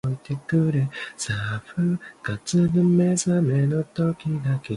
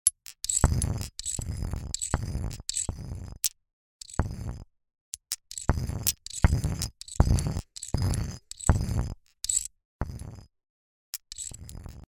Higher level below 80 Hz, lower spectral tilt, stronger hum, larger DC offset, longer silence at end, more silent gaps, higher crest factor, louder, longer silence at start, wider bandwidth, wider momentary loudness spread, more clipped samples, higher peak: second, -54 dBFS vs -34 dBFS; first, -6.5 dB/octave vs -4 dB/octave; neither; neither; about the same, 0 s vs 0.05 s; second, none vs 3.73-4.00 s, 5.01-5.12 s, 9.85-9.99 s, 10.70-11.13 s; second, 14 dB vs 30 dB; first, -23 LUFS vs -30 LUFS; about the same, 0.05 s vs 0.05 s; second, 11.5 kHz vs 16 kHz; second, 10 LU vs 14 LU; neither; second, -8 dBFS vs 0 dBFS